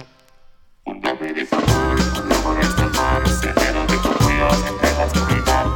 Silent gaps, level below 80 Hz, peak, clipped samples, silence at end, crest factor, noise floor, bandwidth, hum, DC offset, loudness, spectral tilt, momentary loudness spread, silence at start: none; -26 dBFS; -2 dBFS; under 0.1%; 0 s; 16 dB; -47 dBFS; 18.5 kHz; none; under 0.1%; -18 LUFS; -5 dB/octave; 7 LU; 0 s